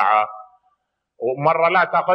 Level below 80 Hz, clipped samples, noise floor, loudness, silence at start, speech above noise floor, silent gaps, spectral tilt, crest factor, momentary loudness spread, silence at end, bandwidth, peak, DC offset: -76 dBFS; under 0.1%; -70 dBFS; -19 LUFS; 0 s; 53 dB; none; -7.5 dB/octave; 16 dB; 11 LU; 0 s; 5.6 kHz; -4 dBFS; under 0.1%